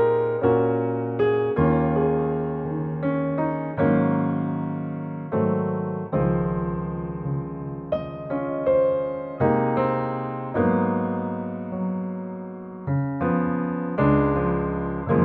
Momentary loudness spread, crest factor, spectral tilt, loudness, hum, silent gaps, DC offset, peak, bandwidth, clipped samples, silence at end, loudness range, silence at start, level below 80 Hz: 9 LU; 16 dB; -12 dB/octave; -24 LUFS; none; none; under 0.1%; -8 dBFS; 4.3 kHz; under 0.1%; 0 s; 4 LU; 0 s; -44 dBFS